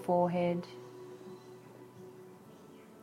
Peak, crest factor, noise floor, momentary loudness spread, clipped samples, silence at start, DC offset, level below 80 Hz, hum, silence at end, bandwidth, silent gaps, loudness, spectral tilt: -18 dBFS; 18 dB; -55 dBFS; 24 LU; under 0.1%; 0 s; under 0.1%; -78 dBFS; none; 0.1 s; 15 kHz; none; -33 LUFS; -8 dB/octave